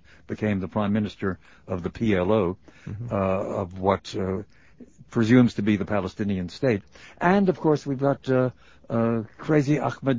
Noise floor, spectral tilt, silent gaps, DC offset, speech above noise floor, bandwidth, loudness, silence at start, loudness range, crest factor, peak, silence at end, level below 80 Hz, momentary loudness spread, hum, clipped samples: -50 dBFS; -8 dB/octave; none; 0.2%; 26 dB; 7.6 kHz; -25 LUFS; 0.3 s; 3 LU; 20 dB; -4 dBFS; 0 s; -48 dBFS; 10 LU; none; under 0.1%